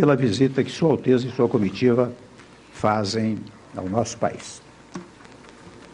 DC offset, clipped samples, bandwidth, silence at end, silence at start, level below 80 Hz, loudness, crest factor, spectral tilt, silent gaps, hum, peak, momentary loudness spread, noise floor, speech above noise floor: under 0.1%; under 0.1%; 10.5 kHz; 0.15 s; 0 s; -58 dBFS; -22 LUFS; 16 dB; -6.5 dB/octave; none; none; -6 dBFS; 20 LU; -46 dBFS; 25 dB